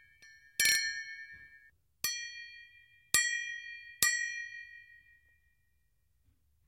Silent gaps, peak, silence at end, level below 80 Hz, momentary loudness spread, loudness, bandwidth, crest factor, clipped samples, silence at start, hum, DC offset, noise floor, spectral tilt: none; -6 dBFS; 1.85 s; -70 dBFS; 23 LU; -32 LUFS; 16 kHz; 32 dB; under 0.1%; 0.2 s; none; under 0.1%; -76 dBFS; 2 dB/octave